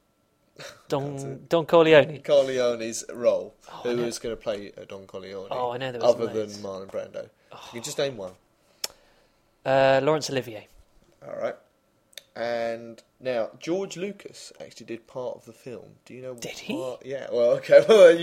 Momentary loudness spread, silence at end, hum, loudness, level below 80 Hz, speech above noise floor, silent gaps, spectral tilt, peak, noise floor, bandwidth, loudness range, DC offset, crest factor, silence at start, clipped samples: 23 LU; 0 s; none; -24 LUFS; -64 dBFS; 43 dB; none; -4.5 dB/octave; -2 dBFS; -67 dBFS; 15.5 kHz; 11 LU; under 0.1%; 22 dB; 0.6 s; under 0.1%